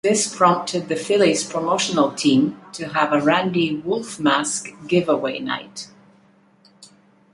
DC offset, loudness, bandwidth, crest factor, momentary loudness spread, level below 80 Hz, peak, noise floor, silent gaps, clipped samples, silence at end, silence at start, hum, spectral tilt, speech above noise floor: under 0.1%; -20 LUFS; 11.5 kHz; 20 dB; 10 LU; -64 dBFS; -2 dBFS; -55 dBFS; none; under 0.1%; 0.5 s; 0.05 s; none; -4 dB/octave; 35 dB